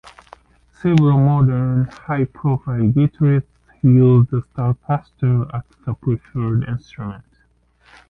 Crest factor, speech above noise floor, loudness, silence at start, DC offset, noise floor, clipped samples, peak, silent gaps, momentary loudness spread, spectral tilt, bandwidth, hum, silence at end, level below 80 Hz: 16 dB; 42 dB; -18 LUFS; 0.85 s; under 0.1%; -59 dBFS; under 0.1%; -2 dBFS; none; 14 LU; -10.5 dB/octave; 4.3 kHz; none; 0.9 s; -46 dBFS